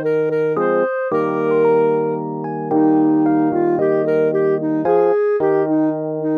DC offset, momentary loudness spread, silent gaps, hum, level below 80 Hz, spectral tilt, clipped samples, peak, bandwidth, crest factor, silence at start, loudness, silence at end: under 0.1%; 5 LU; none; none; -66 dBFS; -10 dB/octave; under 0.1%; -4 dBFS; 4.4 kHz; 12 dB; 0 s; -17 LUFS; 0 s